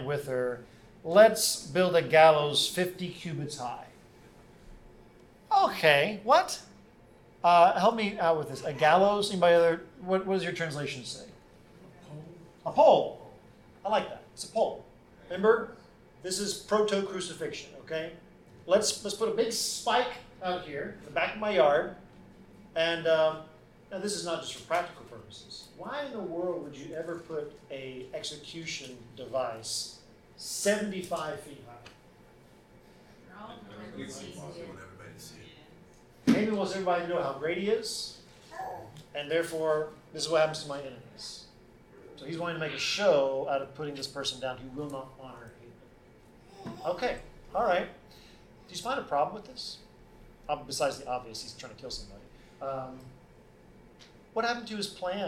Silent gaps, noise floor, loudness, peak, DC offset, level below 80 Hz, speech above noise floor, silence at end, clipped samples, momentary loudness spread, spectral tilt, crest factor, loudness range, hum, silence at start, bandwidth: none; -57 dBFS; -29 LUFS; -6 dBFS; under 0.1%; -62 dBFS; 28 dB; 0 s; under 0.1%; 22 LU; -3.5 dB/octave; 24 dB; 13 LU; none; 0 s; 17 kHz